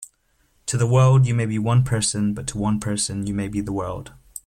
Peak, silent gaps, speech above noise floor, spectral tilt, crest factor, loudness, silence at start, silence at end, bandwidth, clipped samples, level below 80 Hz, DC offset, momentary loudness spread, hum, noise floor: -6 dBFS; none; 43 dB; -5.5 dB/octave; 14 dB; -21 LUFS; 0 s; 0.05 s; 14 kHz; under 0.1%; -46 dBFS; under 0.1%; 13 LU; none; -64 dBFS